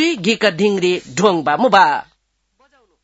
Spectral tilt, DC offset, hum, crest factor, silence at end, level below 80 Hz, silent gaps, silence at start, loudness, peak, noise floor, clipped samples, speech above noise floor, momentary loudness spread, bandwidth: -4.5 dB/octave; under 0.1%; none; 16 dB; 1 s; -60 dBFS; none; 0 s; -15 LUFS; 0 dBFS; -63 dBFS; under 0.1%; 48 dB; 6 LU; 8 kHz